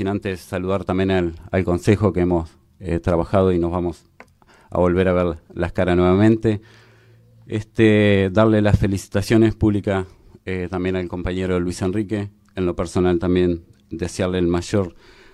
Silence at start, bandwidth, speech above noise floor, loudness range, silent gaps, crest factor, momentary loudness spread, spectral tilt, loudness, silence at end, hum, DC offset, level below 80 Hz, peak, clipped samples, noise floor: 0 s; 13 kHz; 32 dB; 4 LU; none; 18 dB; 12 LU; -7.5 dB/octave; -20 LUFS; 0.4 s; none; under 0.1%; -40 dBFS; 0 dBFS; under 0.1%; -51 dBFS